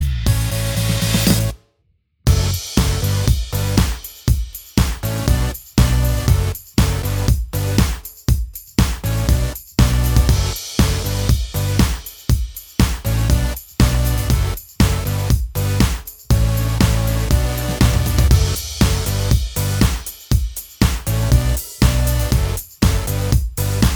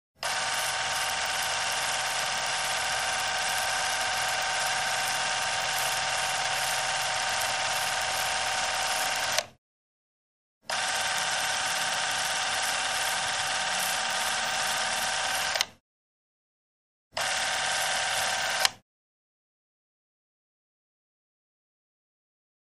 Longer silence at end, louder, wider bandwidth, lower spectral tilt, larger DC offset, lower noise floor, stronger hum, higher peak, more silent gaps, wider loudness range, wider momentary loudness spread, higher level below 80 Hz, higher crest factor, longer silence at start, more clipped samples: second, 0 s vs 3.85 s; first, -18 LUFS vs -27 LUFS; first, over 20 kHz vs 15.5 kHz; first, -5 dB/octave vs 1 dB/octave; second, under 0.1% vs 0.1%; second, -63 dBFS vs under -90 dBFS; neither; about the same, 0 dBFS vs -2 dBFS; second, none vs 9.58-10.61 s, 15.80-17.11 s; about the same, 2 LU vs 3 LU; first, 5 LU vs 1 LU; first, -20 dBFS vs -62 dBFS; second, 16 dB vs 28 dB; second, 0 s vs 0.2 s; neither